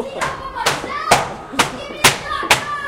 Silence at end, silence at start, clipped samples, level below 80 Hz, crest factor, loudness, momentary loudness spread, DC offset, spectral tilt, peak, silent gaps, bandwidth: 0 s; 0 s; under 0.1%; -42 dBFS; 20 dB; -17 LUFS; 9 LU; under 0.1%; -2 dB/octave; 0 dBFS; none; 17 kHz